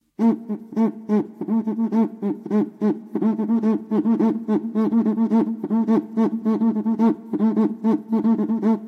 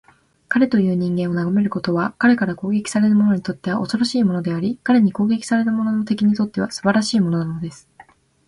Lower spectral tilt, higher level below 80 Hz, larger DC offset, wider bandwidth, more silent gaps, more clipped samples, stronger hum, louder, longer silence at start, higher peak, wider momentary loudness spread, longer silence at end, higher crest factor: first, -10 dB/octave vs -6 dB/octave; second, -76 dBFS vs -56 dBFS; neither; second, 4.3 kHz vs 11.5 kHz; neither; neither; neither; about the same, -21 LUFS vs -19 LUFS; second, 0.2 s vs 0.5 s; second, -8 dBFS vs -4 dBFS; about the same, 4 LU vs 6 LU; second, 0 s vs 0.45 s; about the same, 12 dB vs 16 dB